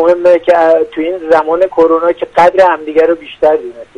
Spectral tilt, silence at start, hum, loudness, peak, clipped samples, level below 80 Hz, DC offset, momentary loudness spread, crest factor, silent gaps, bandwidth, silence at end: -5.5 dB/octave; 0 s; none; -10 LUFS; 0 dBFS; 0.2%; -48 dBFS; under 0.1%; 5 LU; 10 dB; none; 8.2 kHz; 0.15 s